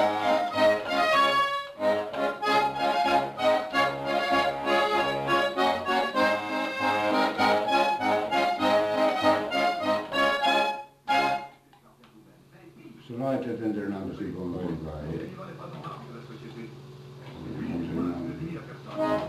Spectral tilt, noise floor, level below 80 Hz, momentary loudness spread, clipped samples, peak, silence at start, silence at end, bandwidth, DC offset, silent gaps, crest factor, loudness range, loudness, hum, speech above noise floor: -4.5 dB/octave; -56 dBFS; -58 dBFS; 17 LU; under 0.1%; -10 dBFS; 0 s; 0 s; 14 kHz; under 0.1%; none; 16 dB; 12 LU; -26 LUFS; none; 24 dB